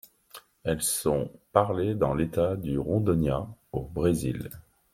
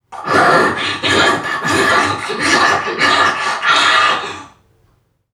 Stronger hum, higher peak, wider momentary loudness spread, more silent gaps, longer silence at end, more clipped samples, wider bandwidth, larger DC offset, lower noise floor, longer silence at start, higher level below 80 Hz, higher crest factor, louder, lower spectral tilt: neither; second, -4 dBFS vs 0 dBFS; first, 11 LU vs 7 LU; neither; second, 0.3 s vs 0.85 s; neither; about the same, 16.5 kHz vs 16.5 kHz; neither; second, -52 dBFS vs -58 dBFS; first, 0.35 s vs 0.1 s; about the same, -48 dBFS vs -52 dBFS; first, 24 dB vs 14 dB; second, -28 LUFS vs -13 LUFS; first, -6 dB/octave vs -2.5 dB/octave